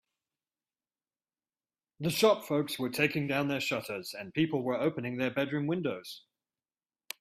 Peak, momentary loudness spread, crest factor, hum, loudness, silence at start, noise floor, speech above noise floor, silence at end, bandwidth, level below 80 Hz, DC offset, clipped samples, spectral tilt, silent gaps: -12 dBFS; 12 LU; 22 dB; none; -31 LUFS; 2 s; under -90 dBFS; over 59 dB; 1 s; 16 kHz; -72 dBFS; under 0.1%; under 0.1%; -5 dB/octave; none